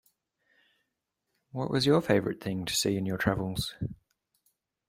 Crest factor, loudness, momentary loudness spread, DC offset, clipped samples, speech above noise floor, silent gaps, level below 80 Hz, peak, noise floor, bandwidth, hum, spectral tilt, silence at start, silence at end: 22 dB; -29 LUFS; 13 LU; under 0.1%; under 0.1%; 55 dB; none; -56 dBFS; -10 dBFS; -83 dBFS; 16 kHz; none; -4.5 dB/octave; 1.55 s; 0.95 s